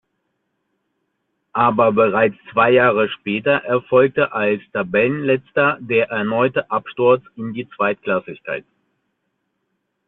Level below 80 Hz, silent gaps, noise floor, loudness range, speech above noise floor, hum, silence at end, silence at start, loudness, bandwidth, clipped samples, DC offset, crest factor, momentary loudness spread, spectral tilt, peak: -60 dBFS; none; -73 dBFS; 5 LU; 55 dB; none; 1.45 s; 1.55 s; -18 LUFS; 4.1 kHz; under 0.1%; under 0.1%; 16 dB; 12 LU; -9.5 dB/octave; -2 dBFS